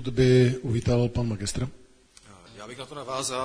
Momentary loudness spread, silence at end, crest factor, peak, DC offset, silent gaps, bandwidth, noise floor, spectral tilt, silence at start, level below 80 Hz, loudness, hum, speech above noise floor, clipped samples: 19 LU; 0 s; 18 dB; -8 dBFS; under 0.1%; none; 10.5 kHz; -53 dBFS; -6 dB/octave; 0 s; -44 dBFS; -25 LUFS; none; 29 dB; under 0.1%